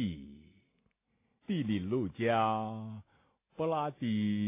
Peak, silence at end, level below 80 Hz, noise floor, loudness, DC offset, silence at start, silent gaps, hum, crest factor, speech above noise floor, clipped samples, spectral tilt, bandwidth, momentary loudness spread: -18 dBFS; 0 s; -62 dBFS; -78 dBFS; -34 LUFS; under 0.1%; 0 s; none; none; 18 dB; 45 dB; under 0.1%; -6 dB/octave; 3.8 kHz; 21 LU